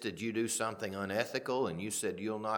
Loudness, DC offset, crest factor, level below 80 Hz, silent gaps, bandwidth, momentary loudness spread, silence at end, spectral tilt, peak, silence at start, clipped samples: -35 LUFS; under 0.1%; 20 dB; -74 dBFS; none; 19 kHz; 3 LU; 0 s; -3.5 dB/octave; -16 dBFS; 0 s; under 0.1%